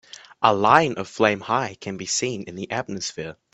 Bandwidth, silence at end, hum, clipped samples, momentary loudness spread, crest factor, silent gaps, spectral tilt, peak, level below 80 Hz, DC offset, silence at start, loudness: 8.6 kHz; 0.2 s; none; under 0.1%; 13 LU; 22 dB; none; -3.5 dB/octave; 0 dBFS; -60 dBFS; under 0.1%; 0.4 s; -22 LUFS